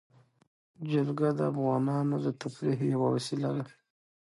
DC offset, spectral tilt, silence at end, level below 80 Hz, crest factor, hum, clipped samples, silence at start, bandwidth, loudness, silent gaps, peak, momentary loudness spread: under 0.1%; -7.5 dB/octave; 0.55 s; -74 dBFS; 16 dB; none; under 0.1%; 0.8 s; 11.5 kHz; -30 LUFS; none; -16 dBFS; 6 LU